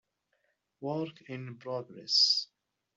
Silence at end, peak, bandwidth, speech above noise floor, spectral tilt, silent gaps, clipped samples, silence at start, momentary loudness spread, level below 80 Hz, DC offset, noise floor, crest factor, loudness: 0.5 s; -14 dBFS; 8.2 kHz; 45 dB; -3 dB/octave; none; under 0.1%; 0.8 s; 19 LU; -84 dBFS; under 0.1%; -77 dBFS; 22 dB; -29 LUFS